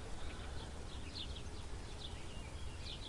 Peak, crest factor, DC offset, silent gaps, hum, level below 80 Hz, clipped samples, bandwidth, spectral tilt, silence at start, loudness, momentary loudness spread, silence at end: -32 dBFS; 14 dB; under 0.1%; none; none; -50 dBFS; under 0.1%; 11.5 kHz; -4 dB/octave; 0 s; -48 LUFS; 3 LU; 0 s